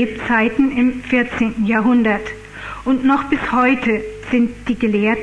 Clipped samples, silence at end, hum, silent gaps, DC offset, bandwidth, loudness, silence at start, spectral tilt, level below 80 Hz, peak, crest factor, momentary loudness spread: under 0.1%; 0 s; 50 Hz at -45 dBFS; none; under 0.1%; 9.8 kHz; -17 LUFS; 0 s; -6.5 dB/octave; -42 dBFS; -4 dBFS; 14 dB; 8 LU